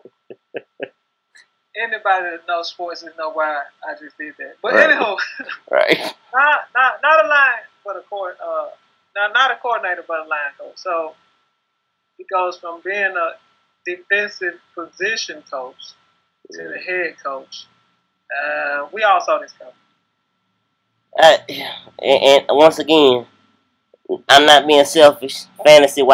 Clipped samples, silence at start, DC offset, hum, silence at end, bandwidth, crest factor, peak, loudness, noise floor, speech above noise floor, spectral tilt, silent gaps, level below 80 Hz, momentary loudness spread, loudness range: under 0.1%; 0.3 s; under 0.1%; none; 0 s; 16 kHz; 18 dB; 0 dBFS; -15 LUFS; -71 dBFS; 55 dB; -2.5 dB/octave; none; -64 dBFS; 21 LU; 12 LU